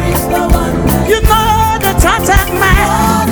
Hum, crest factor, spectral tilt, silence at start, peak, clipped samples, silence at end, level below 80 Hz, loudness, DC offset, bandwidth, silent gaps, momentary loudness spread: none; 10 dB; -4.5 dB/octave; 0 s; 0 dBFS; 0.6%; 0 s; -16 dBFS; -10 LUFS; under 0.1%; over 20 kHz; none; 3 LU